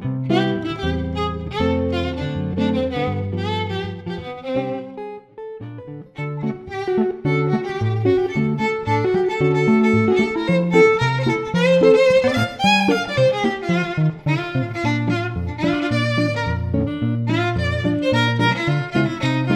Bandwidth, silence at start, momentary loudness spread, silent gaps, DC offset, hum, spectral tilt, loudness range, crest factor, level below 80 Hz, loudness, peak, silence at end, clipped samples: 13 kHz; 0 s; 12 LU; none; under 0.1%; none; -7 dB/octave; 9 LU; 18 dB; -42 dBFS; -19 LUFS; -2 dBFS; 0 s; under 0.1%